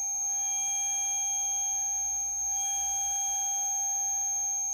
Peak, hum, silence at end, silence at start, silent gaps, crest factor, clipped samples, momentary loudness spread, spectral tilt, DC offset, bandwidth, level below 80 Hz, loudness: -24 dBFS; none; 0 s; 0 s; none; 8 dB; under 0.1%; 1 LU; 3.5 dB/octave; under 0.1%; 19.5 kHz; -62 dBFS; -27 LUFS